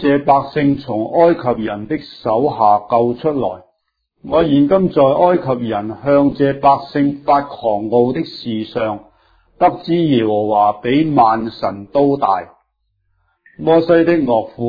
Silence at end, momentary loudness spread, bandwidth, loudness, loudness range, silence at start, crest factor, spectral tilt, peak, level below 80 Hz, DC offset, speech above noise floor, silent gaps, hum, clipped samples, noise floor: 0 s; 10 LU; 5 kHz; -15 LUFS; 3 LU; 0 s; 16 dB; -9.5 dB/octave; 0 dBFS; -48 dBFS; under 0.1%; 55 dB; none; none; under 0.1%; -69 dBFS